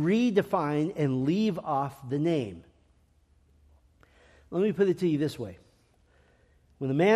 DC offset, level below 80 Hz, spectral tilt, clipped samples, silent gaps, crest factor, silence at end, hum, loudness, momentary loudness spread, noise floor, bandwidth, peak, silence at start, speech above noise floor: under 0.1%; -64 dBFS; -7.5 dB/octave; under 0.1%; none; 18 dB; 0 s; none; -28 LUFS; 11 LU; -64 dBFS; 13.5 kHz; -10 dBFS; 0 s; 38 dB